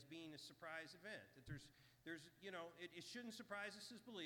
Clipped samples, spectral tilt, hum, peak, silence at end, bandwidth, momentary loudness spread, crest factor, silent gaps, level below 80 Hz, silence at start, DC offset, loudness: under 0.1%; -4 dB/octave; 60 Hz at -80 dBFS; -38 dBFS; 0 s; 19 kHz; 6 LU; 18 dB; none; -80 dBFS; 0 s; under 0.1%; -56 LUFS